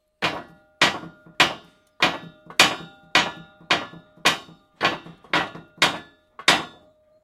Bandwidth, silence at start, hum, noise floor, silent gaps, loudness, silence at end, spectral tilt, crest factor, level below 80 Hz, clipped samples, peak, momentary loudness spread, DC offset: 16.5 kHz; 0.2 s; none; -55 dBFS; none; -22 LUFS; 0.55 s; -1.5 dB/octave; 26 dB; -60 dBFS; under 0.1%; 0 dBFS; 18 LU; under 0.1%